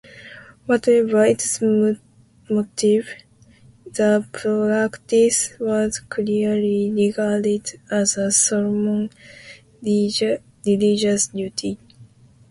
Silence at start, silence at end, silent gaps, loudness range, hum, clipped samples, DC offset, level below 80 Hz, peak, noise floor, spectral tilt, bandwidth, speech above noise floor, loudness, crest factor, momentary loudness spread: 0.15 s; 0.45 s; none; 2 LU; none; under 0.1%; under 0.1%; -58 dBFS; -4 dBFS; -50 dBFS; -4 dB/octave; 11.5 kHz; 31 dB; -20 LUFS; 18 dB; 14 LU